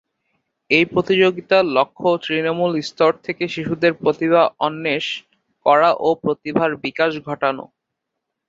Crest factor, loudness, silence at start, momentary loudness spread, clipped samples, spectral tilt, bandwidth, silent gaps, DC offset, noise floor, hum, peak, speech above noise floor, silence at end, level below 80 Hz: 18 dB; -18 LUFS; 0.7 s; 7 LU; under 0.1%; -6 dB/octave; 7.8 kHz; none; under 0.1%; -79 dBFS; none; -2 dBFS; 61 dB; 0.85 s; -60 dBFS